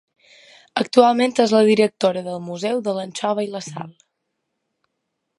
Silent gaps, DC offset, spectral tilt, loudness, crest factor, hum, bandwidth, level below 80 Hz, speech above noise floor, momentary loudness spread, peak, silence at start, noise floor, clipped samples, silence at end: none; under 0.1%; -5 dB/octave; -19 LUFS; 20 dB; none; 11.5 kHz; -72 dBFS; 58 dB; 15 LU; -2 dBFS; 0.75 s; -77 dBFS; under 0.1%; 1.5 s